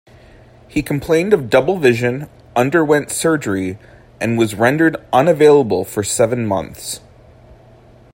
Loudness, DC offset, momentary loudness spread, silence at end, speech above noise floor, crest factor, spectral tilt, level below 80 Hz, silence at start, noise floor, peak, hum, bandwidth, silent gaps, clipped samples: -16 LUFS; under 0.1%; 14 LU; 1.15 s; 30 dB; 16 dB; -5 dB/octave; -48 dBFS; 0.75 s; -45 dBFS; 0 dBFS; none; 16.5 kHz; none; under 0.1%